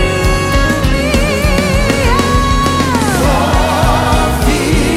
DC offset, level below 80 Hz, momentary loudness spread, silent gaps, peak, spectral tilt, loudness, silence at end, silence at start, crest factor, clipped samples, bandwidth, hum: under 0.1%; -16 dBFS; 1 LU; none; 0 dBFS; -5 dB/octave; -12 LUFS; 0 s; 0 s; 10 dB; under 0.1%; 16 kHz; none